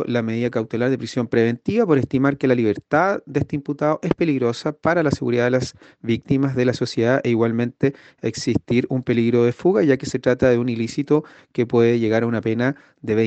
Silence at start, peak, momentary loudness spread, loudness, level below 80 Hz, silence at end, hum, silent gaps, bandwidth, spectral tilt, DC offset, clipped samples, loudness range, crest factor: 0 s; -4 dBFS; 6 LU; -20 LUFS; -52 dBFS; 0 s; none; none; 8.6 kHz; -7 dB/octave; under 0.1%; under 0.1%; 2 LU; 16 dB